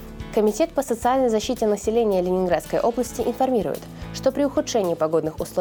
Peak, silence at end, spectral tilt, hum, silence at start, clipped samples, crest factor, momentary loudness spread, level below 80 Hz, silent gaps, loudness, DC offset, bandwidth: -8 dBFS; 0 s; -5 dB/octave; none; 0 s; under 0.1%; 14 dB; 5 LU; -44 dBFS; none; -22 LUFS; under 0.1%; over 20 kHz